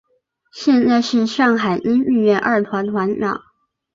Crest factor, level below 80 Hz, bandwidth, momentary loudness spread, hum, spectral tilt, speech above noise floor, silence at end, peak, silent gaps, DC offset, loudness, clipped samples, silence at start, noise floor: 14 dB; -58 dBFS; 7.6 kHz; 7 LU; none; -6 dB/octave; 44 dB; 0.55 s; -4 dBFS; none; under 0.1%; -17 LUFS; under 0.1%; 0.55 s; -60 dBFS